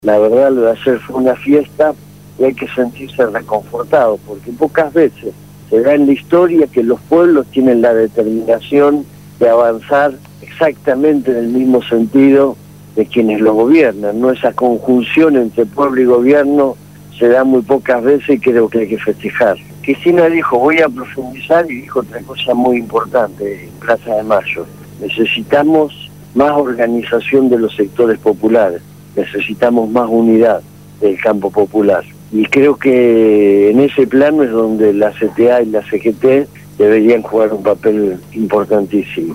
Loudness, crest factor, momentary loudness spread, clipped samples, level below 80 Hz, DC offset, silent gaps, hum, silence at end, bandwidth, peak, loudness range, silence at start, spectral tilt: -12 LUFS; 12 dB; 10 LU; under 0.1%; -50 dBFS; 0.2%; none; 50 Hz at -40 dBFS; 0 s; 16 kHz; 0 dBFS; 4 LU; 0.05 s; -7 dB/octave